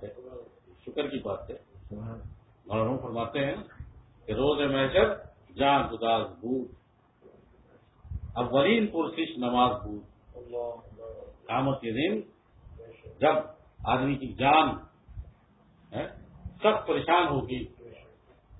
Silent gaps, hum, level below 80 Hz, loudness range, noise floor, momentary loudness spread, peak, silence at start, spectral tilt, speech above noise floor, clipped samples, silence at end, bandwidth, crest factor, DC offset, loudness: none; none; -50 dBFS; 6 LU; -61 dBFS; 23 LU; -8 dBFS; 0 s; -10 dB/octave; 34 dB; under 0.1%; 0.05 s; 4 kHz; 22 dB; under 0.1%; -28 LUFS